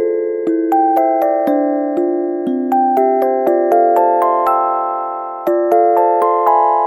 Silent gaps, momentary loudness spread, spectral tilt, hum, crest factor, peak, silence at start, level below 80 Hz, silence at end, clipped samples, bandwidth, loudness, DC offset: none; 6 LU; -6.5 dB/octave; none; 14 dB; 0 dBFS; 0 s; -68 dBFS; 0 s; under 0.1%; 17.5 kHz; -14 LUFS; under 0.1%